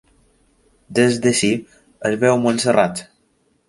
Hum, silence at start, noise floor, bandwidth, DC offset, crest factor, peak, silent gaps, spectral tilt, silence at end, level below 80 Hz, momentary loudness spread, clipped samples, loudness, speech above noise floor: none; 0.9 s; -62 dBFS; 11.5 kHz; under 0.1%; 18 dB; -2 dBFS; none; -4.5 dB/octave; 0.65 s; -56 dBFS; 9 LU; under 0.1%; -18 LUFS; 45 dB